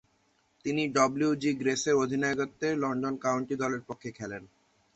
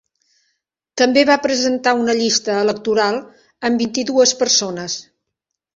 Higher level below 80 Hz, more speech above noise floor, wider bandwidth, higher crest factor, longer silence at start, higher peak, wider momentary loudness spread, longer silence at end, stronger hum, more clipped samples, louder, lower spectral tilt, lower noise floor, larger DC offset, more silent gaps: second, -68 dBFS vs -62 dBFS; second, 41 dB vs 63 dB; about the same, 8.2 kHz vs 7.8 kHz; about the same, 20 dB vs 16 dB; second, 0.65 s vs 0.95 s; second, -10 dBFS vs -2 dBFS; about the same, 13 LU vs 11 LU; second, 0.5 s vs 0.75 s; neither; neither; second, -29 LUFS vs -16 LUFS; first, -4.5 dB/octave vs -2 dB/octave; second, -70 dBFS vs -80 dBFS; neither; neither